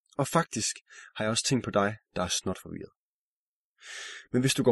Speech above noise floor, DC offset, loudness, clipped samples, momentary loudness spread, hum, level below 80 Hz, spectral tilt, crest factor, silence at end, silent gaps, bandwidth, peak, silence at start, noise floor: over 60 dB; under 0.1%; -29 LUFS; under 0.1%; 16 LU; none; -62 dBFS; -4 dB/octave; 20 dB; 0 s; 0.81-0.85 s, 2.97-3.74 s; 12 kHz; -10 dBFS; 0.2 s; under -90 dBFS